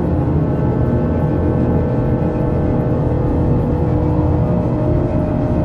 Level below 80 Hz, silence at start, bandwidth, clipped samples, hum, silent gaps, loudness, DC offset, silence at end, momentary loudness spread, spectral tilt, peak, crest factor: -26 dBFS; 0 s; 5.2 kHz; under 0.1%; none; none; -17 LUFS; under 0.1%; 0 s; 1 LU; -11 dB/octave; -4 dBFS; 12 dB